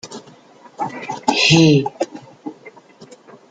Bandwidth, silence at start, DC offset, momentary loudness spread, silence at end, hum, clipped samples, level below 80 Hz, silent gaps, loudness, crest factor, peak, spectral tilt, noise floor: 9.2 kHz; 0.05 s; under 0.1%; 24 LU; 0.8 s; none; under 0.1%; -56 dBFS; none; -16 LUFS; 18 dB; -2 dBFS; -4.5 dB/octave; -45 dBFS